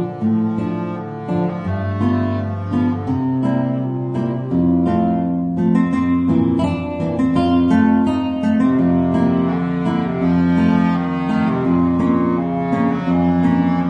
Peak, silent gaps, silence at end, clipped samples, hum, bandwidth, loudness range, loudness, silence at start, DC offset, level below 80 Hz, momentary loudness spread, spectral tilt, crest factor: -4 dBFS; none; 0 s; under 0.1%; none; 7 kHz; 4 LU; -18 LUFS; 0 s; under 0.1%; -44 dBFS; 7 LU; -9.5 dB/octave; 14 dB